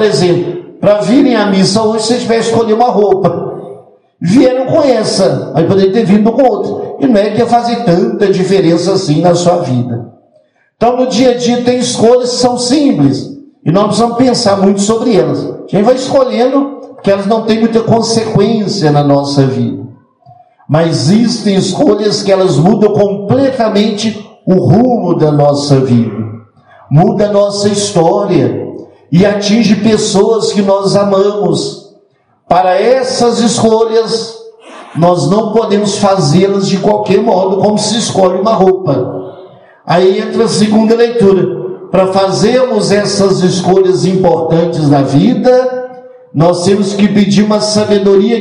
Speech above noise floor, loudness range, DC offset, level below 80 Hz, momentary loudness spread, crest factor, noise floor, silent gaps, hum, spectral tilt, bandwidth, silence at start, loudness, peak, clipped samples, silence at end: 42 dB; 2 LU; under 0.1%; -46 dBFS; 7 LU; 10 dB; -51 dBFS; none; none; -6 dB/octave; 11 kHz; 0 s; -10 LUFS; 0 dBFS; 0.7%; 0 s